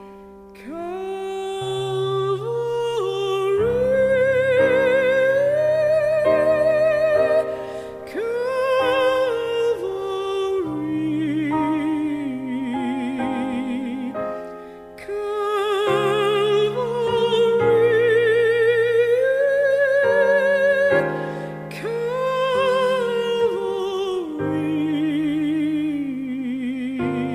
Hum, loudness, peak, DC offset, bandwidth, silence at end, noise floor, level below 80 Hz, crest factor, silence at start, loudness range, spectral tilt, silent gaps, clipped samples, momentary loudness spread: none; -20 LUFS; -6 dBFS; under 0.1%; 14.5 kHz; 0 s; -42 dBFS; -54 dBFS; 14 dB; 0 s; 7 LU; -6 dB/octave; none; under 0.1%; 11 LU